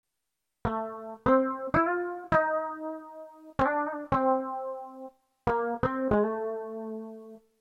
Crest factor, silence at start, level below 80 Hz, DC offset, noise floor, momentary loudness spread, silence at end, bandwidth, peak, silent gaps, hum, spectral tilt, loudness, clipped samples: 20 dB; 0.65 s; -52 dBFS; under 0.1%; -84 dBFS; 16 LU; 0.2 s; 7.6 kHz; -10 dBFS; none; none; -8.5 dB/octave; -29 LUFS; under 0.1%